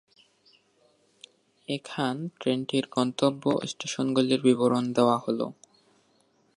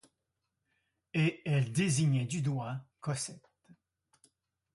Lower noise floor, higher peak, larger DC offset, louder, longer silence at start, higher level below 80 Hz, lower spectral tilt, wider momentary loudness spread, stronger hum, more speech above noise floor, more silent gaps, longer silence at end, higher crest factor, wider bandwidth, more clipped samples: second, -66 dBFS vs -85 dBFS; first, -8 dBFS vs -18 dBFS; neither; first, -27 LUFS vs -33 LUFS; first, 1.7 s vs 1.15 s; second, -76 dBFS vs -70 dBFS; about the same, -5.5 dB/octave vs -5.5 dB/octave; about the same, 10 LU vs 11 LU; neither; second, 40 dB vs 53 dB; neither; second, 1.05 s vs 1.35 s; about the same, 20 dB vs 16 dB; about the same, 11.5 kHz vs 11.5 kHz; neither